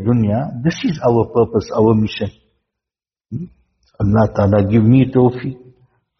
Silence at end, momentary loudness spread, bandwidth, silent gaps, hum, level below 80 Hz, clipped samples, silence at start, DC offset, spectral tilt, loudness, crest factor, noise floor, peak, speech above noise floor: 0.65 s; 17 LU; 6.4 kHz; none; none; -42 dBFS; under 0.1%; 0 s; under 0.1%; -8 dB/octave; -15 LUFS; 16 dB; -89 dBFS; -2 dBFS; 74 dB